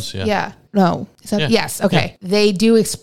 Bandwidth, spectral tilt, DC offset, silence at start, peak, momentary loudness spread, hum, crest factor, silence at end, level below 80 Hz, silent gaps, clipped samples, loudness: 16.5 kHz; -5 dB/octave; 1%; 0 s; 0 dBFS; 7 LU; none; 16 dB; 0 s; -48 dBFS; none; under 0.1%; -17 LUFS